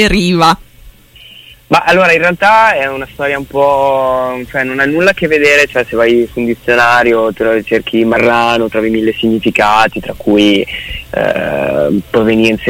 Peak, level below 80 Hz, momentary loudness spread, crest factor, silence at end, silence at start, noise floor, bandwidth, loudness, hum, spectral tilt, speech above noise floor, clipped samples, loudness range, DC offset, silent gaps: 0 dBFS; -34 dBFS; 8 LU; 10 dB; 0 s; 0 s; -38 dBFS; 16.5 kHz; -11 LUFS; none; -5 dB/octave; 28 dB; under 0.1%; 2 LU; under 0.1%; none